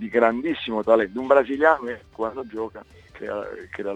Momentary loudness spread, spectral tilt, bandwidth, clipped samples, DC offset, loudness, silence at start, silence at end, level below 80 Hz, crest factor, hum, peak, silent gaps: 14 LU; -6.5 dB/octave; 7.8 kHz; under 0.1%; under 0.1%; -23 LUFS; 0 s; 0 s; -58 dBFS; 20 dB; none; -2 dBFS; none